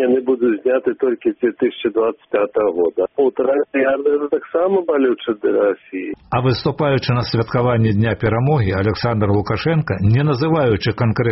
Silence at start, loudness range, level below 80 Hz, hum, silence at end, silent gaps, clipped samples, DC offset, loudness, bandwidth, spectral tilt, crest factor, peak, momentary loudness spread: 0 s; 1 LU; -44 dBFS; none; 0 s; none; under 0.1%; under 0.1%; -18 LUFS; 6 kHz; -6.5 dB/octave; 12 dB; -4 dBFS; 3 LU